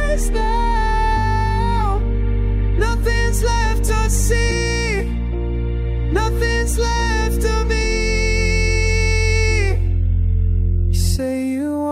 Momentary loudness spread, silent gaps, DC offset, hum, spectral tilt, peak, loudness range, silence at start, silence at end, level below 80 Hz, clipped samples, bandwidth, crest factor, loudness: 4 LU; none; under 0.1%; none; -5 dB/octave; -4 dBFS; 2 LU; 0 s; 0 s; -18 dBFS; under 0.1%; 15 kHz; 12 dB; -19 LUFS